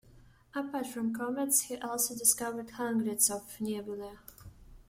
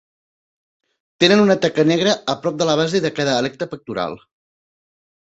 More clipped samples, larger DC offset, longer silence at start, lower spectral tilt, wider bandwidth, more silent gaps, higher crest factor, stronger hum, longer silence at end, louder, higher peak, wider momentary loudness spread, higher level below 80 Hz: neither; neither; second, 0.05 s vs 1.2 s; second, -2.5 dB/octave vs -5 dB/octave; first, 16.5 kHz vs 8 kHz; neither; first, 24 dB vs 18 dB; neither; second, 0.05 s vs 1.05 s; second, -31 LUFS vs -18 LUFS; second, -10 dBFS vs -2 dBFS; first, 15 LU vs 12 LU; about the same, -62 dBFS vs -58 dBFS